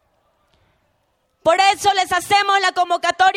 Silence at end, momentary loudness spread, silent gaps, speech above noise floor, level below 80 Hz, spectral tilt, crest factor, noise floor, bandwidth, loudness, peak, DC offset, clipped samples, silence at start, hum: 0 s; 4 LU; none; 49 dB; -58 dBFS; -1 dB/octave; 16 dB; -66 dBFS; 16 kHz; -16 LUFS; -2 dBFS; under 0.1%; under 0.1%; 1.45 s; none